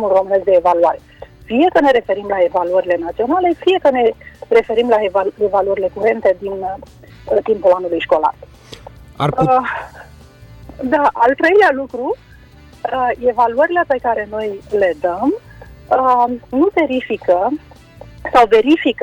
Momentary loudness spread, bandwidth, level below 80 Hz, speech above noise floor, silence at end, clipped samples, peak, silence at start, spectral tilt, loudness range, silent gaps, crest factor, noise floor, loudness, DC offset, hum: 11 LU; 10.5 kHz; -46 dBFS; 27 dB; 0 s; under 0.1%; -2 dBFS; 0 s; -6.5 dB/octave; 3 LU; none; 14 dB; -42 dBFS; -15 LUFS; under 0.1%; none